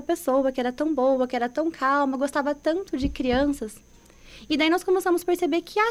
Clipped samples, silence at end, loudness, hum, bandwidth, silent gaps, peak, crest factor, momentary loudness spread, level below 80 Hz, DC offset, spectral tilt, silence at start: under 0.1%; 0 s; -24 LUFS; none; 15.5 kHz; none; -10 dBFS; 14 dB; 5 LU; -46 dBFS; under 0.1%; -4.5 dB/octave; 0 s